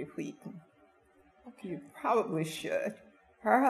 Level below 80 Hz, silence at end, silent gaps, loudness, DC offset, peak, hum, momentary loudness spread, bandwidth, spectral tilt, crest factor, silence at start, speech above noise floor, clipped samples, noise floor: -76 dBFS; 0 s; none; -34 LUFS; under 0.1%; -12 dBFS; none; 21 LU; 14.5 kHz; -5.5 dB/octave; 22 dB; 0 s; 31 dB; under 0.1%; -65 dBFS